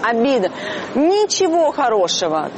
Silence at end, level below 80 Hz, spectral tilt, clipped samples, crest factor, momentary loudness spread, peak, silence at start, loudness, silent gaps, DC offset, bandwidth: 0 s; -60 dBFS; -3 dB/octave; under 0.1%; 10 dB; 7 LU; -6 dBFS; 0 s; -17 LUFS; none; under 0.1%; 8.6 kHz